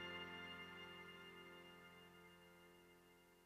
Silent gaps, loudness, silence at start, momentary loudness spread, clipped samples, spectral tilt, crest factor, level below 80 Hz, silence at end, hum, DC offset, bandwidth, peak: none; -57 LUFS; 0 s; 16 LU; under 0.1%; -4 dB/octave; 18 dB; -84 dBFS; 0 s; none; under 0.1%; 15.5 kHz; -40 dBFS